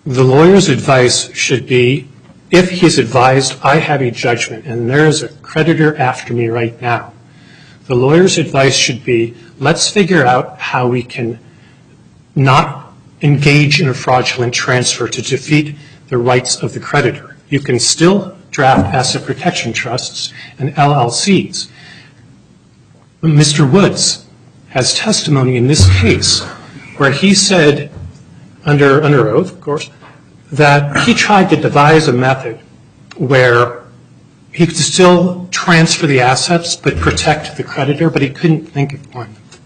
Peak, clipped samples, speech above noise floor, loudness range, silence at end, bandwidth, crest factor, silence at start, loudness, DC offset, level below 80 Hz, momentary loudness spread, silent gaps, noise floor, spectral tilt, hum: 0 dBFS; under 0.1%; 34 dB; 4 LU; 0.1 s; 10.5 kHz; 12 dB; 0.05 s; -11 LUFS; under 0.1%; -40 dBFS; 12 LU; none; -45 dBFS; -4.5 dB/octave; none